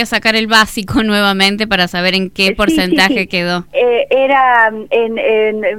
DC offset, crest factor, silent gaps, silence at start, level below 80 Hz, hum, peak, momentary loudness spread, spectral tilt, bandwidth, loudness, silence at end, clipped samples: 0.8%; 12 dB; none; 0 s; -38 dBFS; none; 0 dBFS; 5 LU; -4 dB/octave; 17 kHz; -12 LUFS; 0 s; 0.1%